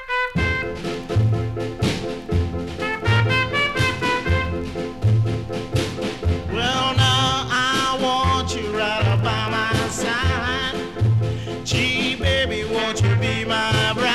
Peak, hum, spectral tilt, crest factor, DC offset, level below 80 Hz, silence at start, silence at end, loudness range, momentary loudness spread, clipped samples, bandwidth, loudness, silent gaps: -4 dBFS; none; -5 dB/octave; 16 dB; under 0.1%; -36 dBFS; 0 s; 0 s; 3 LU; 7 LU; under 0.1%; 13 kHz; -21 LUFS; none